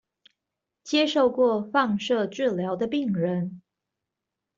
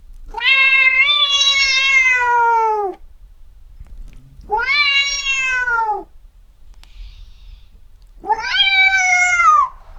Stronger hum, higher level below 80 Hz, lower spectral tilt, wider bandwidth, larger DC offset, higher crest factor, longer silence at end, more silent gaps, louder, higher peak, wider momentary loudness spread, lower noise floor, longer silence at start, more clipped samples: neither; second, -68 dBFS vs -40 dBFS; first, -6 dB/octave vs 1 dB/octave; second, 7.6 kHz vs 13 kHz; neither; about the same, 18 dB vs 16 dB; first, 1 s vs 0 s; neither; second, -25 LUFS vs -13 LUFS; second, -8 dBFS vs -2 dBFS; second, 6 LU vs 12 LU; first, -86 dBFS vs -43 dBFS; first, 0.85 s vs 0.1 s; neither